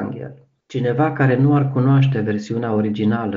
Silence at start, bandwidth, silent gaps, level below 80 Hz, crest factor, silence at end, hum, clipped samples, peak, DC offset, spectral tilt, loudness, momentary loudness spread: 0 s; 7.2 kHz; none; -58 dBFS; 14 dB; 0 s; none; under 0.1%; -4 dBFS; under 0.1%; -8 dB/octave; -18 LUFS; 13 LU